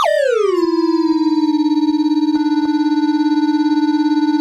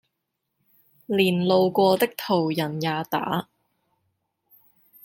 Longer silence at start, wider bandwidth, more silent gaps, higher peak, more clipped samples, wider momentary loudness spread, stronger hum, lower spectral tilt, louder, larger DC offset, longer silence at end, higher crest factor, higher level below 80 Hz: second, 0 s vs 1.1 s; second, 9.4 kHz vs 17 kHz; neither; about the same, -6 dBFS vs -6 dBFS; neither; second, 1 LU vs 8 LU; neither; second, -4 dB/octave vs -6 dB/octave; first, -15 LUFS vs -23 LUFS; neither; second, 0 s vs 1.6 s; second, 10 dB vs 20 dB; first, -62 dBFS vs -68 dBFS